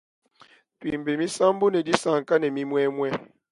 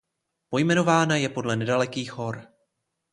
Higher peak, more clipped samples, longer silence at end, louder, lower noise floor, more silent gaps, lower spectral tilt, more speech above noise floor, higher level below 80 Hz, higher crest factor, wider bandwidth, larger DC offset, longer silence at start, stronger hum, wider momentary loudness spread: first, -2 dBFS vs -6 dBFS; neither; second, 0.3 s vs 0.7 s; about the same, -24 LUFS vs -24 LUFS; second, -57 dBFS vs -77 dBFS; neither; about the same, -5 dB/octave vs -5 dB/octave; second, 33 dB vs 53 dB; about the same, -64 dBFS vs -64 dBFS; about the same, 24 dB vs 20 dB; about the same, 11.5 kHz vs 11.5 kHz; neither; first, 0.8 s vs 0.5 s; neither; second, 9 LU vs 13 LU